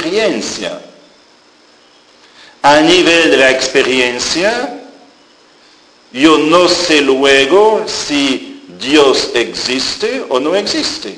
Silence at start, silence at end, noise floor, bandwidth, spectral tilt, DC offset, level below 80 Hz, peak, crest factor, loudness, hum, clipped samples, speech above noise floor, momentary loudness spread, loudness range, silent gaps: 0 s; 0 s; -46 dBFS; 10.5 kHz; -2.5 dB/octave; under 0.1%; -48 dBFS; 0 dBFS; 12 dB; -11 LUFS; none; 0.2%; 35 dB; 13 LU; 3 LU; none